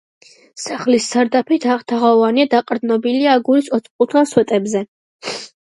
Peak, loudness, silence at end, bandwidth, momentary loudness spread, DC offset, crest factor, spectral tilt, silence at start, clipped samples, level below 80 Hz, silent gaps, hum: 0 dBFS; -16 LUFS; 0.2 s; 11.5 kHz; 13 LU; under 0.1%; 16 dB; -4.5 dB/octave; 0.55 s; under 0.1%; -66 dBFS; 3.91-3.99 s, 4.88-5.19 s; none